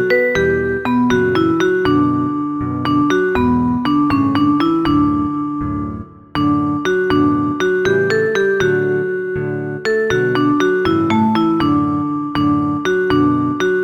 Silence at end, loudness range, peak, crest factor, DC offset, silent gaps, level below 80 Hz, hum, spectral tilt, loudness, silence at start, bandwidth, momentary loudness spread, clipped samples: 0 s; 1 LU; -2 dBFS; 14 dB; under 0.1%; none; -40 dBFS; none; -7 dB/octave; -16 LUFS; 0 s; 7.4 kHz; 6 LU; under 0.1%